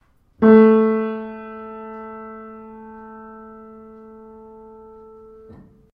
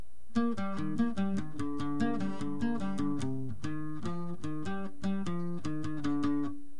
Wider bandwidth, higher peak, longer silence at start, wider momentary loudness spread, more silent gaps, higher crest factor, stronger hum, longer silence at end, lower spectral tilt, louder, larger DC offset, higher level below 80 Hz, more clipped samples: second, 4.3 kHz vs 11 kHz; first, 0 dBFS vs -18 dBFS; about the same, 0.4 s vs 0.3 s; first, 28 LU vs 7 LU; neither; first, 22 dB vs 14 dB; neither; first, 3.45 s vs 0.05 s; first, -11 dB/octave vs -7 dB/octave; first, -15 LUFS vs -35 LUFS; second, under 0.1% vs 2%; about the same, -58 dBFS vs -60 dBFS; neither